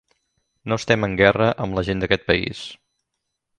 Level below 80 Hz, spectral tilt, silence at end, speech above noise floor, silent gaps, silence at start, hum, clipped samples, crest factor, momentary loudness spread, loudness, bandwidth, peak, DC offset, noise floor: -44 dBFS; -5.5 dB/octave; 0.85 s; 58 dB; none; 0.65 s; none; under 0.1%; 22 dB; 17 LU; -20 LUFS; 10.5 kHz; 0 dBFS; under 0.1%; -79 dBFS